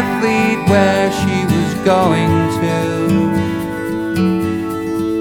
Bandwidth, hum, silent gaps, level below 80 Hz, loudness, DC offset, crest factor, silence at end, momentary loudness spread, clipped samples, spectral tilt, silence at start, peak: 18.5 kHz; none; none; -42 dBFS; -15 LUFS; under 0.1%; 14 dB; 0 s; 7 LU; under 0.1%; -6.5 dB/octave; 0 s; 0 dBFS